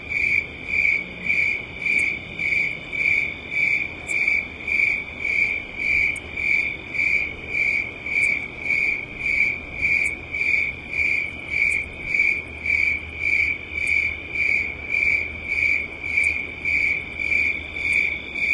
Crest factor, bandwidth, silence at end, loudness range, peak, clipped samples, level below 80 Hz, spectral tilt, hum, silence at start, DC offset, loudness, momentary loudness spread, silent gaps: 16 dB; 11.5 kHz; 0 s; 1 LU; -8 dBFS; under 0.1%; -46 dBFS; -3 dB/octave; none; 0 s; under 0.1%; -21 LUFS; 5 LU; none